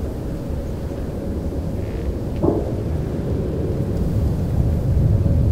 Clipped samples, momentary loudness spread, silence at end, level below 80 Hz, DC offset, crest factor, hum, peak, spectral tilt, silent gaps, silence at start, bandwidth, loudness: under 0.1%; 9 LU; 0 s; -28 dBFS; under 0.1%; 16 dB; none; -4 dBFS; -9.5 dB/octave; none; 0 s; 15.5 kHz; -23 LUFS